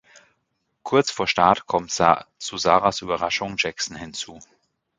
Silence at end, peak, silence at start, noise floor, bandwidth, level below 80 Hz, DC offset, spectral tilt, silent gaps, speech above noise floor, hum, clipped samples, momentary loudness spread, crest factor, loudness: 0.55 s; 0 dBFS; 0.85 s; -74 dBFS; 9.6 kHz; -54 dBFS; under 0.1%; -3 dB/octave; none; 52 dB; none; under 0.1%; 13 LU; 22 dB; -22 LUFS